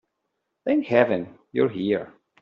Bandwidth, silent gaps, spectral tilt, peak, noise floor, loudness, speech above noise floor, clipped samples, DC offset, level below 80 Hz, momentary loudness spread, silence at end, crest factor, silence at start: 6.4 kHz; none; -5.5 dB/octave; -4 dBFS; -78 dBFS; -24 LUFS; 56 dB; under 0.1%; under 0.1%; -68 dBFS; 11 LU; 0.3 s; 20 dB; 0.65 s